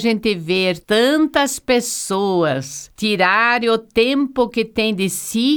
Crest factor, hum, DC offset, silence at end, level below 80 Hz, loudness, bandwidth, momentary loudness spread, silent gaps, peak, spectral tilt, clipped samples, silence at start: 16 dB; none; under 0.1%; 0 s; -50 dBFS; -17 LUFS; over 20 kHz; 6 LU; none; -2 dBFS; -3.5 dB/octave; under 0.1%; 0 s